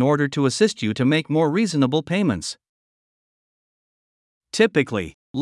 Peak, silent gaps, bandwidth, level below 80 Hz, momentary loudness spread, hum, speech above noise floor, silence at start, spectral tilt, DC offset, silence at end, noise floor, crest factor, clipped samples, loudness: -4 dBFS; 2.69-4.41 s, 5.14-5.34 s; 12 kHz; -60 dBFS; 11 LU; none; over 70 dB; 0 s; -5.5 dB/octave; under 0.1%; 0 s; under -90 dBFS; 18 dB; under 0.1%; -21 LUFS